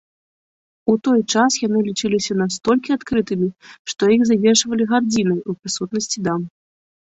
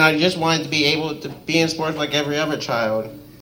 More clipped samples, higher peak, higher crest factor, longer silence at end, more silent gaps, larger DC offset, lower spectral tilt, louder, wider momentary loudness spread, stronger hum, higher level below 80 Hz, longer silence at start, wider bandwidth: neither; about the same, -2 dBFS vs -2 dBFS; about the same, 16 dB vs 18 dB; first, 0.55 s vs 0 s; first, 3.79-3.85 s vs none; neither; about the same, -4 dB/octave vs -4 dB/octave; about the same, -19 LUFS vs -20 LUFS; about the same, 10 LU vs 9 LU; neither; about the same, -56 dBFS vs -56 dBFS; first, 0.85 s vs 0 s; second, 8.2 kHz vs 16.5 kHz